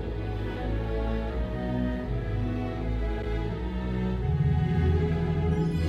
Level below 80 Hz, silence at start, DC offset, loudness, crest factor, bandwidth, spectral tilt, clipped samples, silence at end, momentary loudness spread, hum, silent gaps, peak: -32 dBFS; 0 s; under 0.1%; -29 LUFS; 14 dB; 7.4 kHz; -9 dB/octave; under 0.1%; 0 s; 7 LU; none; none; -14 dBFS